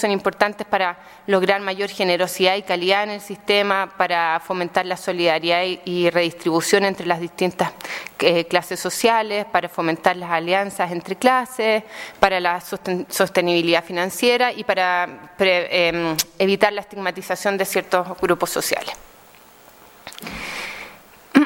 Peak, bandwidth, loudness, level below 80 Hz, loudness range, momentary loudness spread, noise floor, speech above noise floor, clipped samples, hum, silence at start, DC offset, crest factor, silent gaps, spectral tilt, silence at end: 0 dBFS; 17 kHz; -20 LUFS; -58 dBFS; 3 LU; 9 LU; -48 dBFS; 27 dB; under 0.1%; none; 0 s; under 0.1%; 20 dB; none; -3.5 dB/octave; 0 s